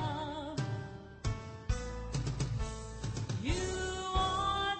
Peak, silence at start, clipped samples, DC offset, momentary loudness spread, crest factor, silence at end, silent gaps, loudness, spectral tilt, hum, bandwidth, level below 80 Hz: -18 dBFS; 0 s; under 0.1%; under 0.1%; 9 LU; 18 dB; 0 s; none; -37 LUFS; -4.5 dB/octave; none; 8.8 kHz; -42 dBFS